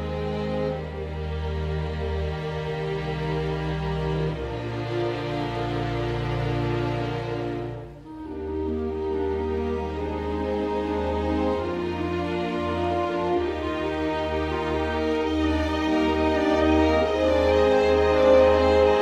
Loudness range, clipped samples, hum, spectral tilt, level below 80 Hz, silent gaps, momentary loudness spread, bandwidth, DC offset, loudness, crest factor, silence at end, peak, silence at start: 7 LU; under 0.1%; none; -7 dB/octave; -36 dBFS; none; 10 LU; 10 kHz; under 0.1%; -25 LUFS; 18 dB; 0 s; -6 dBFS; 0 s